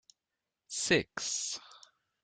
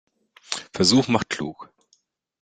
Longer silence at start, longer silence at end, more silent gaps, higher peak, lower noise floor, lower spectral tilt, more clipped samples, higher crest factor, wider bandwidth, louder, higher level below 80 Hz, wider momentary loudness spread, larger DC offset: first, 0.7 s vs 0.5 s; second, 0.45 s vs 0.8 s; neither; second, -14 dBFS vs -2 dBFS; first, -89 dBFS vs -66 dBFS; second, -2 dB/octave vs -4 dB/octave; neither; about the same, 24 dB vs 22 dB; about the same, 10.5 kHz vs 9.6 kHz; second, -33 LUFS vs -22 LUFS; second, -68 dBFS vs -60 dBFS; about the same, 12 LU vs 14 LU; neither